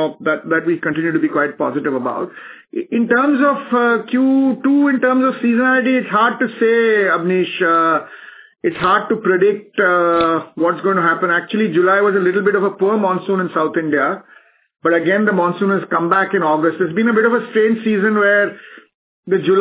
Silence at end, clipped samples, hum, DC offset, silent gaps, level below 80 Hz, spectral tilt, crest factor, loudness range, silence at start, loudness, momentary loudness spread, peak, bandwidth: 0 s; under 0.1%; none; under 0.1%; 18.94-19.23 s; -62 dBFS; -10 dB/octave; 14 dB; 3 LU; 0 s; -16 LUFS; 7 LU; -2 dBFS; 4 kHz